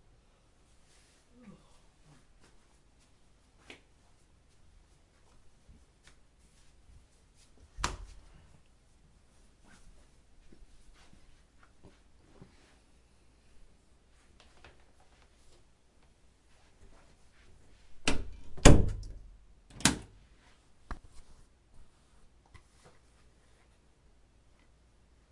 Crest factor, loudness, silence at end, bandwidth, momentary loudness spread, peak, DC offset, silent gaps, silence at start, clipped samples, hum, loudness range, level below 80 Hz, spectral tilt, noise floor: 34 dB; -29 LUFS; 4.35 s; 11.5 kHz; 35 LU; -2 dBFS; under 0.1%; none; 7.8 s; under 0.1%; none; 27 LU; -42 dBFS; -4.5 dB/octave; -64 dBFS